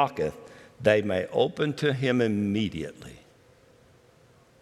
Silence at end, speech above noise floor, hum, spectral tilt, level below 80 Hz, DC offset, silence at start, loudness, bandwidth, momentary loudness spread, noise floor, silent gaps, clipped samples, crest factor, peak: 1.45 s; 32 dB; none; -6.5 dB/octave; -62 dBFS; under 0.1%; 0 s; -26 LUFS; 13 kHz; 16 LU; -58 dBFS; none; under 0.1%; 20 dB; -8 dBFS